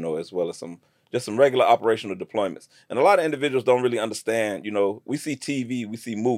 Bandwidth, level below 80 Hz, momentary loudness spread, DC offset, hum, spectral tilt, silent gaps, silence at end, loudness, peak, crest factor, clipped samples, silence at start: 16 kHz; -78 dBFS; 12 LU; under 0.1%; none; -5 dB/octave; none; 0 s; -23 LUFS; -6 dBFS; 18 dB; under 0.1%; 0 s